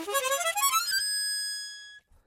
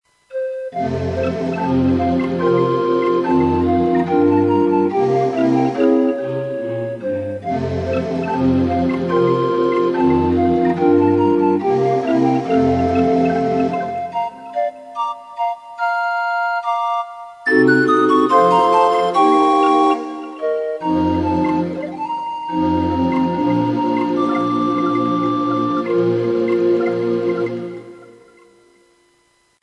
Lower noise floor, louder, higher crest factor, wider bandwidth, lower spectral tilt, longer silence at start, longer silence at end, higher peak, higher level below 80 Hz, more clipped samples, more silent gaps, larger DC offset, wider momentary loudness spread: second, -50 dBFS vs -59 dBFS; second, -27 LUFS vs -17 LUFS; about the same, 16 dB vs 16 dB; first, 17 kHz vs 10.5 kHz; second, 2.5 dB/octave vs -7.5 dB/octave; second, 0 s vs 0.3 s; second, 0.25 s vs 1.55 s; second, -14 dBFS vs 0 dBFS; second, -70 dBFS vs -52 dBFS; neither; neither; neither; first, 13 LU vs 10 LU